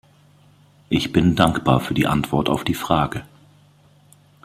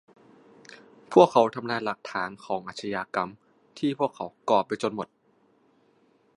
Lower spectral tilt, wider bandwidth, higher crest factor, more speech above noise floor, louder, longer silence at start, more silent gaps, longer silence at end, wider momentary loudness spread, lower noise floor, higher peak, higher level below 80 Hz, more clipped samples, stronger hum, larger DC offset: about the same, -6 dB/octave vs -5.5 dB/octave; first, 16 kHz vs 11 kHz; about the same, 20 dB vs 24 dB; second, 34 dB vs 39 dB; first, -20 LUFS vs -26 LUFS; second, 0.9 s vs 1.1 s; neither; about the same, 1.2 s vs 1.3 s; second, 7 LU vs 14 LU; second, -53 dBFS vs -65 dBFS; about the same, -2 dBFS vs -2 dBFS; first, -44 dBFS vs -72 dBFS; neither; first, 50 Hz at -45 dBFS vs none; neither